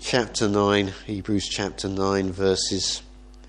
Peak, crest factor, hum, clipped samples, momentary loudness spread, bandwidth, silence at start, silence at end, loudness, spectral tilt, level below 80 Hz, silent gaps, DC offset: -6 dBFS; 20 dB; none; under 0.1%; 7 LU; 10.5 kHz; 0 s; 0 s; -24 LUFS; -4 dB/octave; -46 dBFS; none; under 0.1%